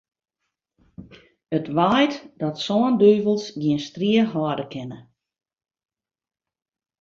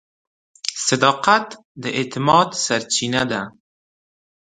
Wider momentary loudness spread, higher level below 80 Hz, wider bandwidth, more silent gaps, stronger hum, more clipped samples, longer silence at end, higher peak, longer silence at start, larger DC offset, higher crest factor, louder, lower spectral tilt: about the same, 13 LU vs 12 LU; about the same, -62 dBFS vs -58 dBFS; second, 7.4 kHz vs 11 kHz; second, none vs 1.65-1.75 s; neither; neither; first, 2 s vs 1.1 s; second, -4 dBFS vs 0 dBFS; first, 1 s vs 0.65 s; neither; about the same, 20 dB vs 22 dB; about the same, -21 LUFS vs -19 LUFS; first, -6.5 dB/octave vs -3 dB/octave